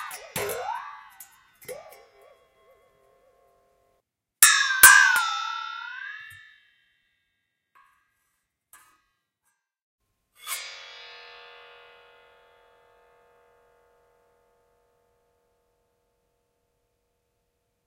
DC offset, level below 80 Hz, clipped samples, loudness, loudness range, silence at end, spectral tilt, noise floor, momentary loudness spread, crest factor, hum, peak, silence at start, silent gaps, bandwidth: under 0.1%; -66 dBFS; under 0.1%; -19 LUFS; 23 LU; 7.05 s; 2 dB/octave; -78 dBFS; 31 LU; 28 dB; none; 0 dBFS; 0 s; 9.82-9.98 s; 16 kHz